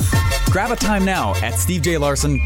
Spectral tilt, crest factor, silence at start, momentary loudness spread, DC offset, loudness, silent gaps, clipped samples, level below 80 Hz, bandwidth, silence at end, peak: -4.5 dB/octave; 12 dB; 0 s; 2 LU; under 0.1%; -18 LUFS; none; under 0.1%; -26 dBFS; 17 kHz; 0 s; -6 dBFS